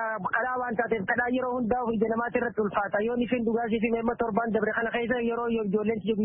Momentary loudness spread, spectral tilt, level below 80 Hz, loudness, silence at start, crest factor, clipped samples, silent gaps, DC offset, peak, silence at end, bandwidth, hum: 2 LU; -10.5 dB/octave; -56 dBFS; -27 LUFS; 0 s; 16 dB; under 0.1%; none; under 0.1%; -12 dBFS; 0 s; 3.6 kHz; none